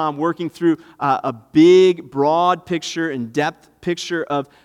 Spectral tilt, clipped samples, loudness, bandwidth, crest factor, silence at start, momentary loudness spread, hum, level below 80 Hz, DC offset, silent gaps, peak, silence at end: -5.5 dB/octave; under 0.1%; -18 LUFS; 11 kHz; 16 dB; 0 s; 12 LU; none; -62 dBFS; under 0.1%; none; -2 dBFS; 0.2 s